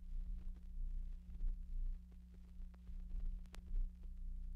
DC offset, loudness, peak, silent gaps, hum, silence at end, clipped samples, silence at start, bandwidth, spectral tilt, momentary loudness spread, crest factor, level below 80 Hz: under 0.1%; -53 LUFS; -32 dBFS; none; 60 Hz at -60 dBFS; 0 s; under 0.1%; 0 s; 3.2 kHz; -7 dB/octave; 9 LU; 12 dB; -44 dBFS